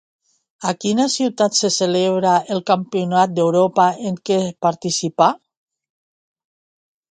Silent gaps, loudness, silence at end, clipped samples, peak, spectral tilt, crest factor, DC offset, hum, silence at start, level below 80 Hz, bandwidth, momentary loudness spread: none; -18 LUFS; 1.75 s; under 0.1%; 0 dBFS; -4.5 dB/octave; 18 dB; under 0.1%; none; 0.6 s; -66 dBFS; 9.4 kHz; 6 LU